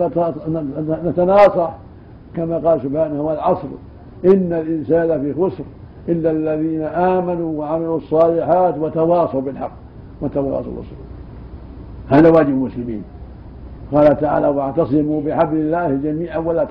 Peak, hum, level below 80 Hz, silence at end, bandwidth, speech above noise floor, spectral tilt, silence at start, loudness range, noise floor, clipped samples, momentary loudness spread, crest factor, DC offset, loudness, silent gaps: -2 dBFS; none; -42 dBFS; 0 s; 5.4 kHz; 22 dB; -10.5 dB/octave; 0 s; 3 LU; -39 dBFS; under 0.1%; 22 LU; 14 dB; under 0.1%; -17 LUFS; none